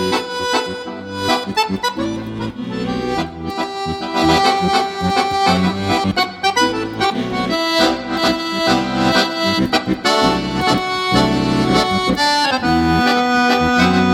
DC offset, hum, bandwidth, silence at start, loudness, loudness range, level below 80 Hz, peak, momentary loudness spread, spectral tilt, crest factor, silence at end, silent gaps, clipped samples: under 0.1%; none; 16.5 kHz; 0 s; -16 LUFS; 5 LU; -40 dBFS; 0 dBFS; 9 LU; -4.5 dB/octave; 16 dB; 0 s; none; under 0.1%